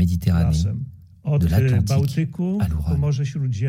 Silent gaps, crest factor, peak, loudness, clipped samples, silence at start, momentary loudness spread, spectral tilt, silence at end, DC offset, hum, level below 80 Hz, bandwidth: none; 14 dB; -6 dBFS; -21 LUFS; under 0.1%; 0 s; 7 LU; -7.5 dB/octave; 0 s; under 0.1%; none; -36 dBFS; 16 kHz